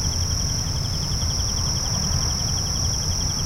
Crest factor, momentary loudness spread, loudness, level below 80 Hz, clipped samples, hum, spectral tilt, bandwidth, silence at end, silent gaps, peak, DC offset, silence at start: 12 dB; 2 LU; -22 LUFS; -30 dBFS; under 0.1%; none; -3 dB/octave; 16 kHz; 0 s; none; -10 dBFS; under 0.1%; 0 s